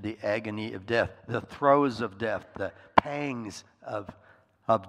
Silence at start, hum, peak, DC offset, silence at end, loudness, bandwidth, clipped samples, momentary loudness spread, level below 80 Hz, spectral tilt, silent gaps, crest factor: 0 s; none; 0 dBFS; under 0.1%; 0 s; -29 LUFS; 11.5 kHz; under 0.1%; 14 LU; -62 dBFS; -6 dB/octave; none; 30 dB